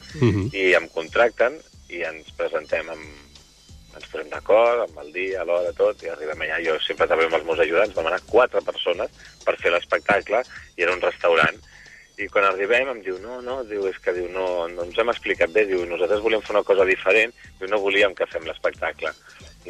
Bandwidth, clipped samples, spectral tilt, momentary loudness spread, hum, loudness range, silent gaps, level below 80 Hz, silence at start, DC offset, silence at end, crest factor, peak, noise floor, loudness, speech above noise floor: 11.5 kHz; under 0.1%; -5 dB/octave; 13 LU; none; 4 LU; none; -52 dBFS; 0 s; under 0.1%; 0 s; 16 dB; -6 dBFS; -48 dBFS; -22 LUFS; 25 dB